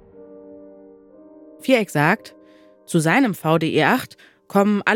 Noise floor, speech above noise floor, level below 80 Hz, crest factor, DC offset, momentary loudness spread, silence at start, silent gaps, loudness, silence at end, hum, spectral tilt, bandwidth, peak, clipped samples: -50 dBFS; 31 dB; -70 dBFS; 20 dB; under 0.1%; 7 LU; 0.2 s; none; -19 LUFS; 0 s; none; -5.5 dB/octave; 18 kHz; -2 dBFS; under 0.1%